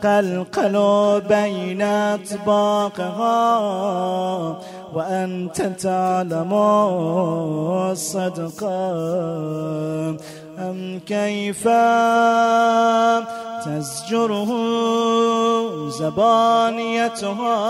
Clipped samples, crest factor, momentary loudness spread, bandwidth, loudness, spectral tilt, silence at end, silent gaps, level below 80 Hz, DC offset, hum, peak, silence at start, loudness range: under 0.1%; 14 dB; 11 LU; 15 kHz; -20 LUFS; -5.5 dB/octave; 0 s; none; -64 dBFS; under 0.1%; none; -6 dBFS; 0 s; 6 LU